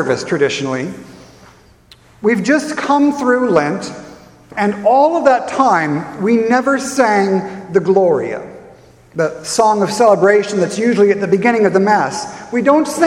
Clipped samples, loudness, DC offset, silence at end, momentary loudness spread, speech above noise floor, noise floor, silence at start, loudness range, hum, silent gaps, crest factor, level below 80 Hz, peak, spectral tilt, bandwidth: under 0.1%; -14 LUFS; under 0.1%; 0 s; 11 LU; 32 dB; -46 dBFS; 0 s; 4 LU; none; none; 14 dB; -56 dBFS; 0 dBFS; -5 dB/octave; 13.5 kHz